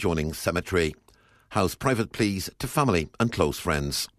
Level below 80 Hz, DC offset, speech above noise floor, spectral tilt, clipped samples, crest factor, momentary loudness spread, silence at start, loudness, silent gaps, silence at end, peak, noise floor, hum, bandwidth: -44 dBFS; under 0.1%; 29 dB; -5 dB/octave; under 0.1%; 18 dB; 4 LU; 0 s; -26 LUFS; none; 0.1 s; -8 dBFS; -54 dBFS; none; 14 kHz